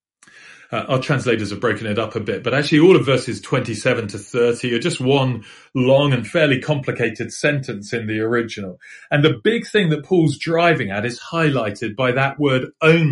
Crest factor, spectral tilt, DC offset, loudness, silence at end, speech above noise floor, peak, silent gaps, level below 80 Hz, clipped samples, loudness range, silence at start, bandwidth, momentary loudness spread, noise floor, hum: 18 dB; -6 dB/octave; under 0.1%; -19 LUFS; 0 s; 29 dB; -2 dBFS; none; -56 dBFS; under 0.1%; 2 LU; 0.45 s; 11.5 kHz; 9 LU; -47 dBFS; none